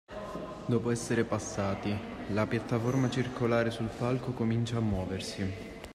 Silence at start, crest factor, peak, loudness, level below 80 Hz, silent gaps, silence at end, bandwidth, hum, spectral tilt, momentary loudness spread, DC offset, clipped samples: 0.1 s; 16 dB; -16 dBFS; -32 LUFS; -54 dBFS; none; 0 s; 13 kHz; none; -6 dB/octave; 8 LU; under 0.1%; under 0.1%